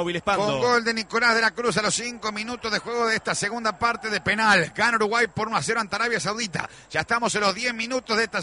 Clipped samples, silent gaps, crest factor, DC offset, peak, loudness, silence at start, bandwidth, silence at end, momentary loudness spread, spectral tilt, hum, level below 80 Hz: under 0.1%; none; 16 dB; under 0.1%; -8 dBFS; -23 LUFS; 0 s; 11 kHz; 0 s; 8 LU; -3 dB/octave; none; -56 dBFS